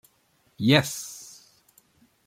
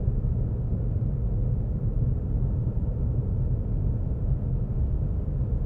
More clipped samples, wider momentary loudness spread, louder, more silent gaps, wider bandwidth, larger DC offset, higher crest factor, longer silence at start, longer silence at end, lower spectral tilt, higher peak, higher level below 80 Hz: neither; first, 22 LU vs 1 LU; first, -23 LUFS vs -28 LUFS; neither; first, 16.5 kHz vs 1.9 kHz; neither; first, 24 dB vs 14 dB; first, 0.6 s vs 0 s; first, 1 s vs 0 s; second, -4.5 dB/octave vs -13 dB/octave; first, -4 dBFS vs -12 dBFS; second, -62 dBFS vs -28 dBFS